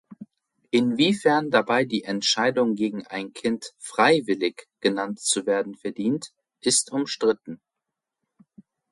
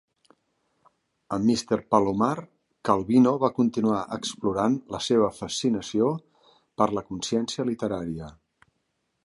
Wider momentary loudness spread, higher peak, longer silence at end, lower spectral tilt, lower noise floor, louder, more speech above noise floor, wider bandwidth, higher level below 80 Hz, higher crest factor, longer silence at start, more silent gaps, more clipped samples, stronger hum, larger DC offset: about the same, 12 LU vs 11 LU; about the same, -6 dBFS vs -6 dBFS; first, 1.35 s vs 0.95 s; second, -3 dB/octave vs -5.5 dB/octave; first, -85 dBFS vs -76 dBFS; about the same, -24 LUFS vs -25 LUFS; first, 62 dB vs 51 dB; about the same, 11.5 kHz vs 11.5 kHz; second, -70 dBFS vs -58 dBFS; about the same, 18 dB vs 20 dB; second, 0.1 s vs 1.3 s; neither; neither; neither; neither